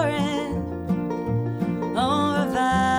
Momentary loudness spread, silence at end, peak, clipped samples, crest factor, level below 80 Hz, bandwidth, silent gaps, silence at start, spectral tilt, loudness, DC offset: 6 LU; 0 s; -10 dBFS; under 0.1%; 14 dB; -44 dBFS; over 20 kHz; none; 0 s; -6 dB/octave; -24 LUFS; under 0.1%